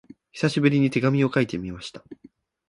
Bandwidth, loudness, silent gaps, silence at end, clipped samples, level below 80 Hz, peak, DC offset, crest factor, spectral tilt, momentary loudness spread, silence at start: 11.5 kHz; -22 LUFS; none; 0.55 s; under 0.1%; -56 dBFS; -6 dBFS; under 0.1%; 20 dB; -7 dB/octave; 17 LU; 0.35 s